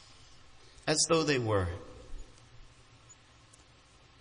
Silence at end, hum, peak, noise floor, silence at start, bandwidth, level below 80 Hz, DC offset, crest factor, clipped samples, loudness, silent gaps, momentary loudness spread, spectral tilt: 1.1 s; none; -14 dBFS; -60 dBFS; 0.5 s; 10.5 kHz; -56 dBFS; under 0.1%; 22 dB; under 0.1%; -29 LUFS; none; 25 LU; -3.5 dB/octave